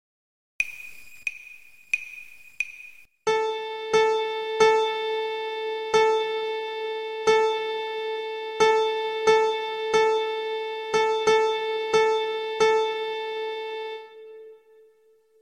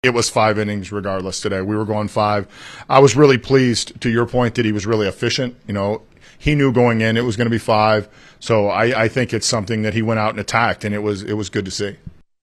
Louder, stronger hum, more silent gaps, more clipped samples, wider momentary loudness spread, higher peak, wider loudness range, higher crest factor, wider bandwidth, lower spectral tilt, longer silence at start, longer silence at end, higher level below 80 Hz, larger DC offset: second, -25 LUFS vs -18 LUFS; neither; neither; neither; first, 14 LU vs 9 LU; second, -6 dBFS vs 0 dBFS; about the same, 5 LU vs 3 LU; about the same, 18 dB vs 18 dB; second, 11 kHz vs 13 kHz; second, -2 dB/octave vs -5 dB/octave; first, 0.6 s vs 0.05 s; first, 0.85 s vs 0.35 s; second, -68 dBFS vs -44 dBFS; neither